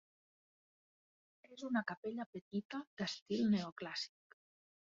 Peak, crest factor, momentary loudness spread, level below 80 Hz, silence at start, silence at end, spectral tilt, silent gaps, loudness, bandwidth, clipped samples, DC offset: -24 dBFS; 20 dB; 12 LU; -82 dBFS; 1.5 s; 0.85 s; -4 dB/octave; 1.97-2.03 s, 2.26-2.33 s, 2.41-2.51 s, 2.65-2.69 s, 2.87-2.97 s, 3.22-3.26 s, 3.72-3.76 s; -41 LUFS; 7.6 kHz; under 0.1%; under 0.1%